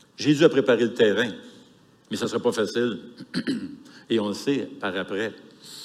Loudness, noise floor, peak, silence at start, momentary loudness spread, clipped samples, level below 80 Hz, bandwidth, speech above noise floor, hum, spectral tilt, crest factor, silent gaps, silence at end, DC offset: -24 LUFS; -55 dBFS; -4 dBFS; 0.2 s; 16 LU; under 0.1%; -74 dBFS; 14 kHz; 31 dB; none; -5 dB/octave; 20 dB; none; 0 s; under 0.1%